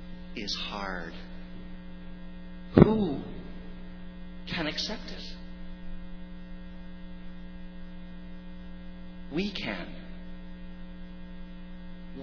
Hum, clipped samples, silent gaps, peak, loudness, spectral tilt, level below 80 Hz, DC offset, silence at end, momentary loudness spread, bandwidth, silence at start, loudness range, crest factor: none; under 0.1%; none; 0 dBFS; -30 LUFS; -5.5 dB/octave; -42 dBFS; under 0.1%; 0 s; 16 LU; 5.4 kHz; 0 s; 17 LU; 34 dB